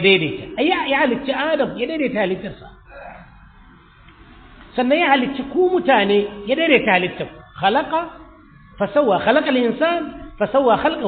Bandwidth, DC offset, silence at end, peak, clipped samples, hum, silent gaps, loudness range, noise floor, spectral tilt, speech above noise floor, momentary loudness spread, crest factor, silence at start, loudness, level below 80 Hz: 4.7 kHz; under 0.1%; 0 s; -2 dBFS; under 0.1%; none; none; 7 LU; -47 dBFS; -10 dB/octave; 29 dB; 14 LU; 18 dB; 0 s; -18 LUFS; -48 dBFS